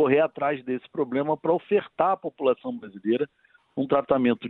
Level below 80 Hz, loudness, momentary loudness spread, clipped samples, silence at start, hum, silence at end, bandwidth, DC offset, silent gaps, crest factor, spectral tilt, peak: -66 dBFS; -26 LUFS; 10 LU; under 0.1%; 0 s; none; 0 s; 4.1 kHz; under 0.1%; none; 18 dB; -10 dB/octave; -8 dBFS